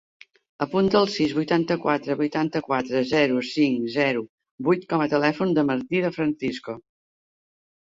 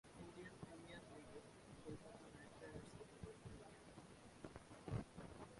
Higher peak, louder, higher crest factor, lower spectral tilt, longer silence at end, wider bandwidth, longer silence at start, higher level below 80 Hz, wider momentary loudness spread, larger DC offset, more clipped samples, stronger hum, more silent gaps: first, -6 dBFS vs -36 dBFS; first, -23 LUFS vs -58 LUFS; about the same, 18 dB vs 22 dB; about the same, -6.5 dB/octave vs -6 dB/octave; first, 1.1 s vs 0 s; second, 7.8 kHz vs 11.5 kHz; first, 0.6 s vs 0.05 s; first, -62 dBFS vs -68 dBFS; about the same, 9 LU vs 10 LU; neither; neither; neither; first, 4.29-4.38 s, 4.51-4.58 s vs none